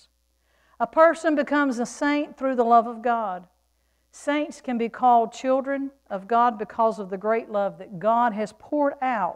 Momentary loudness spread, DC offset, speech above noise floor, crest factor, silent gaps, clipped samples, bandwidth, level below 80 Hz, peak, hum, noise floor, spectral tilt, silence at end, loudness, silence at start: 11 LU; under 0.1%; 45 dB; 20 dB; none; under 0.1%; 11 kHz; -66 dBFS; -4 dBFS; none; -68 dBFS; -5 dB/octave; 0 s; -23 LUFS; 0.8 s